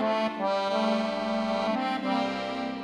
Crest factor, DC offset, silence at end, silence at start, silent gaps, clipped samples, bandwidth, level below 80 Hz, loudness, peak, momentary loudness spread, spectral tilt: 12 dB; under 0.1%; 0 s; 0 s; none; under 0.1%; 11.5 kHz; -62 dBFS; -28 LUFS; -16 dBFS; 3 LU; -5.5 dB/octave